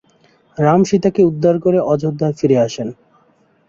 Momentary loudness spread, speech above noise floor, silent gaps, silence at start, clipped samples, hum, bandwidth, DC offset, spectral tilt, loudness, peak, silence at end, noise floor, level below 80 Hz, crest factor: 9 LU; 41 dB; none; 0.6 s; under 0.1%; none; 7.6 kHz; under 0.1%; -7.5 dB/octave; -15 LUFS; -2 dBFS; 0.75 s; -56 dBFS; -54 dBFS; 14 dB